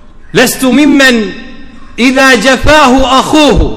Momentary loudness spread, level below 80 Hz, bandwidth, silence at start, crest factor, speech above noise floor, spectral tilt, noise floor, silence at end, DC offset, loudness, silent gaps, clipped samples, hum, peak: 9 LU; -20 dBFS; 19.5 kHz; 0.35 s; 6 dB; 20 dB; -4 dB/octave; -26 dBFS; 0 s; under 0.1%; -6 LUFS; none; 6%; none; 0 dBFS